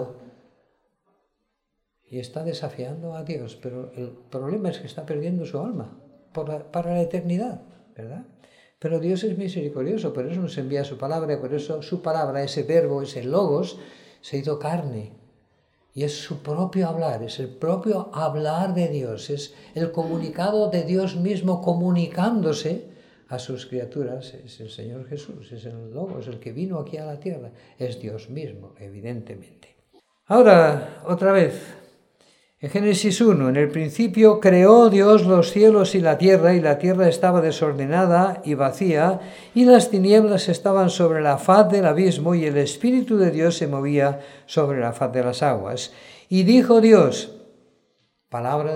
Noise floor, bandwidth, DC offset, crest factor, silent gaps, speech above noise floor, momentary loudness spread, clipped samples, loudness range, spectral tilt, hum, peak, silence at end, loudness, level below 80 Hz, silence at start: -76 dBFS; 14.5 kHz; under 0.1%; 20 dB; none; 56 dB; 21 LU; under 0.1%; 18 LU; -6.5 dB/octave; none; 0 dBFS; 0 s; -20 LUFS; -66 dBFS; 0 s